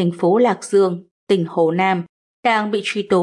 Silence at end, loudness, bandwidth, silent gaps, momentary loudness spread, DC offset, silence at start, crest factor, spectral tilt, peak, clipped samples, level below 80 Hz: 0 s; -18 LUFS; 11.5 kHz; 1.11-1.27 s, 2.09-2.43 s; 7 LU; under 0.1%; 0 s; 14 dB; -6 dB/octave; -4 dBFS; under 0.1%; -68 dBFS